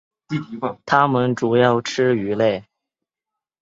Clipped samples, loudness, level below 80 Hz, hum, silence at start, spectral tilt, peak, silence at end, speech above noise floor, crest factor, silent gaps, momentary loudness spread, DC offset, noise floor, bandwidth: under 0.1%; -19 LUFS; -60 dBFS; none; 0.3 s; -6 dB/octave; -2 dBFS; 1 s; 67 dB; 20 dB; none; 12 LU; under 0.1%; -85 dBFS; 7.8 kHz